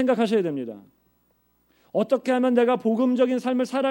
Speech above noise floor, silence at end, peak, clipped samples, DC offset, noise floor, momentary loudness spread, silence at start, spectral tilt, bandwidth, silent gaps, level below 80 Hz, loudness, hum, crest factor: 44 dB; 0 s; -8 dBFS; under 0.1%; under 0.1%; -66 dBFS; 9 LU; 0 s; -6.5 dB/octave; 16 kHz; none; -74 dBFS; -23 LUFS; none; 16 dB